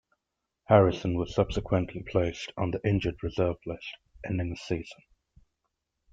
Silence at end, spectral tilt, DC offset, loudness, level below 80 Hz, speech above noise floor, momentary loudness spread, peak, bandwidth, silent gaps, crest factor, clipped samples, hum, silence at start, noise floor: 1.2 s; -7.5 dB/octave; under 0.1%; -29 LUFS; -48 dBFS; 57 dB; 15 LU; -6 dBFS; 7.8 kHz; none; 22 dB; under 0.1%; none; 0.7 s; -84 dBFS